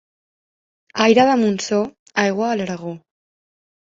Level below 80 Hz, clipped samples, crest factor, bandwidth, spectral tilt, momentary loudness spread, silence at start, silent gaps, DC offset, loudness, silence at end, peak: -64 dBFS; under 0.1%; 18 dB; 7.8 kHz; -4.5 dB/octave; 17 LU; 0.95 s; 1.99-2.06 s; under 0.1%; -18 LUFS; 0.95 s; -2 dBFS